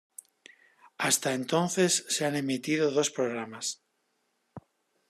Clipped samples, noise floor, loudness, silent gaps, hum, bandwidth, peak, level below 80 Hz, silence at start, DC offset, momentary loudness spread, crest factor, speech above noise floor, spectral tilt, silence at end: under 0.1%; -76 dBFS; -28 LUFS; none; none; 14 kHz; -12 dBFS; -78 dBFS; 1 s; under 0.1%; 10 LU; 20 dB; 47 dB; -3 dB/octave; 0.5 s